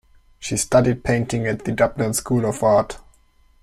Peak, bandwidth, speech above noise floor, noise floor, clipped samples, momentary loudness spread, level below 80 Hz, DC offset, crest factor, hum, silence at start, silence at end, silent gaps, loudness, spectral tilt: -2 dBFS; 15 kHz; 36 dB; -55 dBFS; under 0.1%; 10 LU; -44 dBFS; under 0.1%; 18 dB; none; 0.4 s; 0.65 s; none; -20 LUFS; -5.5 dB/octave